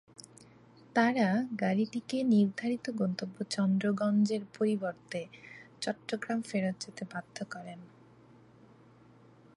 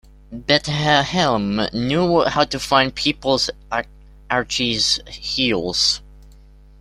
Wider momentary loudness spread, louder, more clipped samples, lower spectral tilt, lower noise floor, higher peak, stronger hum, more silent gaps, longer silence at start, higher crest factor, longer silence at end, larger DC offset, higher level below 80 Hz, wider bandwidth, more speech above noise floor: first, 16 LU vs 9 LU; second, -32 LUFS vs -19 LUFS; neither; first, -6 dB/octave vs -3.5 dB/octave; first, -59 dBFS vs -45 dBFS; second, -14 dBFS vs -2 dBFS; neither; neither; about the same, 0.2 s vs 0.3 s; about the same, 20 dB vs 18 dB; first, 1.7 s vs 0.5 s; neither; second, -78 dBFS vs -42 dBFS; second, 11.5 kHz vs 15 kHz; about the same, 27 dB vs 26 dB